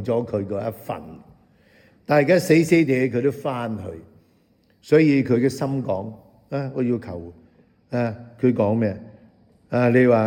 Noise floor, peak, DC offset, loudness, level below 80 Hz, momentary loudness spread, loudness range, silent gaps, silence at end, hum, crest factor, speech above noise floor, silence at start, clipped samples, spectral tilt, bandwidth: -60 dBFS; -4 dBFS; under 0.1%; -21 LUFS; -62 dBFS; 19 LU; 5 LU; none; 0 s; none; 18 dB; 40 dB; 0 s; under 0.1%; -7.5 dB/octave; 17.5 kHz